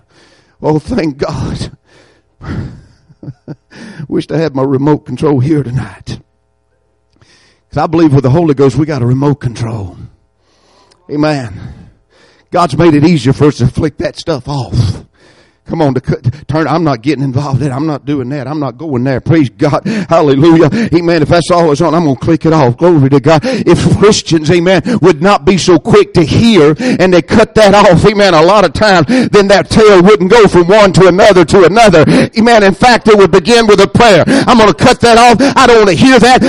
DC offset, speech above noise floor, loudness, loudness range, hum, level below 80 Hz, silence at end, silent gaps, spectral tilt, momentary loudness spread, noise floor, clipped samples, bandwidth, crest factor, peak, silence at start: under 0.1%; 50 dB; -8 LUFS; 11 LU; none; -32 dBFS; 0 s; none; -6 dB/octave; 13 LU; -57 dBFS; 0.8%; 11.5 kHz; 8 dB; 0 dBFS; 0.6 s